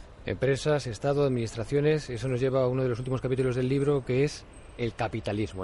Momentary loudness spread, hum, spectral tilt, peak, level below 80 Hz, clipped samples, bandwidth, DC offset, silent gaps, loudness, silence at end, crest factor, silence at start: 6 LU; none; -7 dB/octave; -14 dBFS; -48 dBFS; under 0.1%; 11.5 kHz; under 0.1%; none; -28 LUFS; 0 s; 14 dB; 0 s